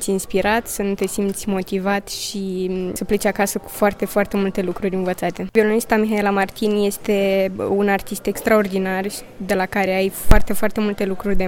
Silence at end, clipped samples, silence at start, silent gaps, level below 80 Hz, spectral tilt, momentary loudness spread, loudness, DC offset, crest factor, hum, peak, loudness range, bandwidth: 0 s; under 0.1%; 0 s; none; -28 dBFS; -5 dB/octave; 6 LU; -20 LUFS; under 0.1%; 18 dB; none; 0 dBFS; 3 LU; 17 kHz